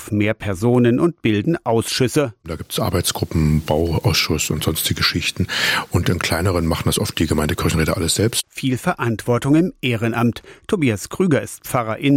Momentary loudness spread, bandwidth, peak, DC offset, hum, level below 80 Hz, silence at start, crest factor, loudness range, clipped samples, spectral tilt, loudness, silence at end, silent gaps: 5 LU; 17 kHz; -4 dBFS; under 0.1%; none; -40 dBFS; 0 s; 14 dB; 1 LU; under 0.1%; -5 dB/octave; -19 LUFS; 0 s; none